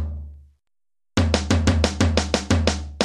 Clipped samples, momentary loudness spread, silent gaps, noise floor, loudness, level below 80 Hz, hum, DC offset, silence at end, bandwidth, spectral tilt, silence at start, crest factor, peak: under 0.1%; 12 LU; none; -86 dBFS; -21 LUFS; -30 dBFS; none; under 0.1%; 0 s; 11 kHz; -5 dB/octave; 0 s; 20 dB; -2 dBFS